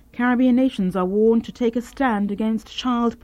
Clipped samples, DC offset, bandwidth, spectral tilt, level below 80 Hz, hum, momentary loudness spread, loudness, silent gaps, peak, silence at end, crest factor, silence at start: under 0.1%; under 0.1%; 11.5 kHz; -6.5 dB/octave; -50 dBFS; none; 6 LU; -21 LUFS; none; -8 dBFS; 0.1 s; 12 dB; 0.15 s